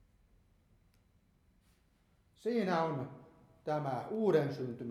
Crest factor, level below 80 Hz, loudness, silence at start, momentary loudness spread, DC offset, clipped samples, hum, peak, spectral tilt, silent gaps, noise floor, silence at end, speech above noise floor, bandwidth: 20 dB; -72 dBFS; -35 LUFS; 2.45 s; 11 LU; under 0.1%; under 0.1%; none; -18 dBFS; -7.5 dB/octave; none; -71 dBFS; 0 s; 37 dB; 13.5 kHz